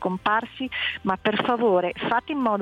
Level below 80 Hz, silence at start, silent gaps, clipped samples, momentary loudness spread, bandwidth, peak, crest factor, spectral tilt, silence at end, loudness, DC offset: -58 dBFS; 0 s; none; under 0.1%; 5 LU; 9.4 kHz; -8 dBFS; 16 dB; -7 dB/octave; 0 s; -24 LUFS; under 0.1%